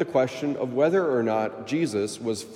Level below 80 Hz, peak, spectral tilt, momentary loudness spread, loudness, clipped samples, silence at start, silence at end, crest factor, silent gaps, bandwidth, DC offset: -74 dBFS; -10 dBFS; -5.5 dB/octave; 6 LU; -25 LUFS; under 0.1%; 0 s; 0 s; 16 dB; none; 15 kHz; under 0.1%